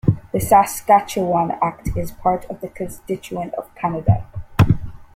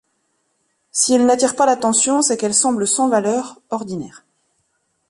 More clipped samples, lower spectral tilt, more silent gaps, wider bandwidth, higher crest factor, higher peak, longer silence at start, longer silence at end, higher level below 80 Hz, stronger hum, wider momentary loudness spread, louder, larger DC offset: neither; first, -6.5 dB/octave vs -2.5 dB/octave; neither; first, 16.5 kHz vs 11.5 kHz; about the same, 18 dB vs 16 dB; about the same, -2 dBFS vs -2 dBFS; second, 0.05 s vs 0.95 s; second, 0.15 s vs 1 s; first, -36 dBFS vs -62 dBFS; neither; about the same, 14 LU vs 13 LU; second, -20 LUFS vs -16 LUFS; neither